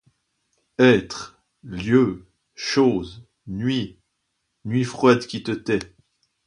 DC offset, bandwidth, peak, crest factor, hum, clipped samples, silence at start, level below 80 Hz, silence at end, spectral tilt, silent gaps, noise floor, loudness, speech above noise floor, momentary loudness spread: under 0.1%; 10.5 kHz; -2 dBFS; 22 dB; none; under 0.1%; 0.8 s; -54 dBFS; 0.6 s; -6 dB/octave; none; -75 dBFS; -21 LUFS; 55 dB; 20 LU